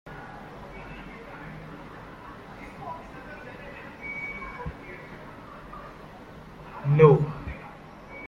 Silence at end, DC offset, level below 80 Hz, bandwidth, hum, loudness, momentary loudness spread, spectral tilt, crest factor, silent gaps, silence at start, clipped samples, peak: 0 s; under 0.1%; -50 dBFS; 6.4 kHz; none; -25 LUFS; 20 LU; -9 dB/octave; 26 dB; none; 0.05 s; under 0.1%; -4 dBFS